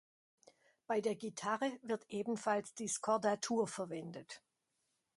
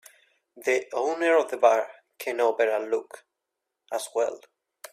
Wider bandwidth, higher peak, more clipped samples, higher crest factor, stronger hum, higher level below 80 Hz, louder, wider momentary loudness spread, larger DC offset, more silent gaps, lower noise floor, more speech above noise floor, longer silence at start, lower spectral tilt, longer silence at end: second, 11.5 kHz vs 15.5 kHz; second, -22 dBFS vs -6 dBFS; neither; about the same, 18 dB vs 22 dB; neither; about the same, -84 dBFS vs -80 dBFS; second, -39 LUFS vs -26 LUFS; about the same, 12 LU vs 13 LU; neither; neither; about the same, -84 dBFS vs -84 dBFS; second, 46 dB vs 59 dB; first, 0.9 s vs 0.55 s; first, -4 dB/octave vs -2 dB/octave; first, 0.8 s vs 0.55 s